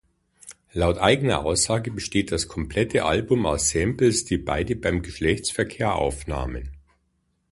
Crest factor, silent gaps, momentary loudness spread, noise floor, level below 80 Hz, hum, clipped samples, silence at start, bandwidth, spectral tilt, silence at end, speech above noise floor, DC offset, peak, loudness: 20 dB; none; 9 LU; -70 dBFS; -38 dBFS; none; under 0.1%; 0.45 s; 11.5 kHz; -4.5 dB/octave; 0.7 s; 47 dB; under 0.1%; -4 dBFS; -23 LUFS